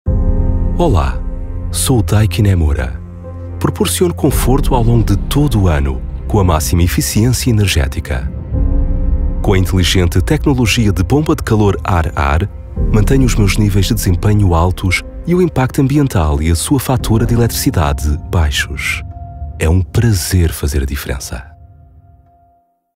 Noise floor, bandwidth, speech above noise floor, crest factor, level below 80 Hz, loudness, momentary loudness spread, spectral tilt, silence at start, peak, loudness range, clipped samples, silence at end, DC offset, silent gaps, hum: -55 dBFS; 16.5 kHz; 43 dB; 12 dB; -20 dBFS; -14 LUFS; 9 LU; -5.5 dB/octave; 0.05 s; 0 dBFS; 2 LU; under 0.1%; 1.3 s; under 0.1%; none; none